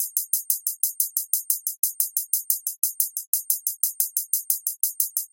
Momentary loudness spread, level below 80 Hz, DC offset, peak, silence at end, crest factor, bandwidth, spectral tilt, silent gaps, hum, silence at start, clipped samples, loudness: 3 LU; under -90 dBFS; under 0.1%; 0 dBFS; 0.05 s; 26 dB; 18 kHz; 10 dB/octave; 1.79-1.83 s, 3.27-3.33 s; none; 0 s; under 0.1%; -23 LUFS